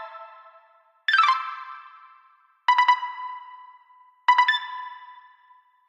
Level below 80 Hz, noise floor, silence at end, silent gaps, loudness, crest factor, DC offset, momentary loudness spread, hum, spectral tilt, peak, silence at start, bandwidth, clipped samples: under -90 dBFS; -59 dBFS; 0.75 s; none; -22 LUFS; 20 dB; under 0.1%; 23 LU; none; 5.5 dB/octave; -6 dBFS; 0 s; 9 kHz; under 0.1%